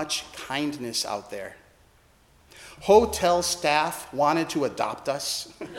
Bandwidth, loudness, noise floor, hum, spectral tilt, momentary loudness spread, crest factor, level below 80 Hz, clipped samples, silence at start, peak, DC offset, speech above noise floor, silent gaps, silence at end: 17 kHz; -25 LUFS; -59 dBFS; none; -3 dB/octave; 15 LU; 22 dB; -54 dBFS; under 0.1%; 0 s; -4 dBFS; under 0.1%; 33 dB; none; 0 s